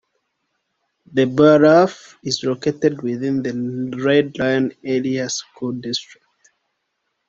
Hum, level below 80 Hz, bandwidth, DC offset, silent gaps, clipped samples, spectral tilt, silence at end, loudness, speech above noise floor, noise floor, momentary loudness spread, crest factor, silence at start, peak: none; -60 dBFS; 7.8 kHz; under 0.1%; none; under 0.1%; -5.5 dB/octave; 1.25 s; -18 LUFS; 56 dB; -74 dBFS; 13 LU; 18 dB; 1.1 s; -2 dBFS